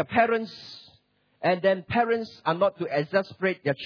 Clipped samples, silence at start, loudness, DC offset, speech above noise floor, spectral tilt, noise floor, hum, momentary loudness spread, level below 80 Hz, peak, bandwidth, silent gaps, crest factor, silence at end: under 0.1%; 0 s; -26 LUFS; under 0.1%; 39 dB; -7 dB/octave; -64 dBFS; none; 14 LU; -64 dBFS; -8 dBFS; 5.4 kHz; none; 18 dB; 0 s